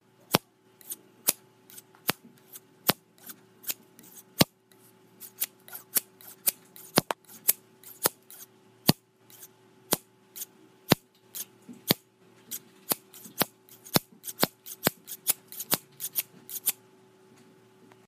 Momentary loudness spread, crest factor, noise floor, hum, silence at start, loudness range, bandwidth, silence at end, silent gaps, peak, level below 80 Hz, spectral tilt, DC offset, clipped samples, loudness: 21 LU; 34 dB; -59 dBFS; none; 0.3 s; 3 LU; 15.5 kHz; 1.35 s; none; 0 dBFS; -66 dBFS; -2.5 dB/octave; under 0.1%; under 0.1%; -30 LUFS